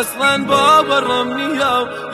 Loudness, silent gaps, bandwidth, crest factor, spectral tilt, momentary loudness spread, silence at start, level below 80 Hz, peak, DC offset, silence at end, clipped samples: -14 LUFS; none; 13.5 kHz; 14 dB; -3 dB/octave; 7 LU; 0 s; -52 dBFS; -2 dBFS; under 0.1%; 0 s; under 0.1%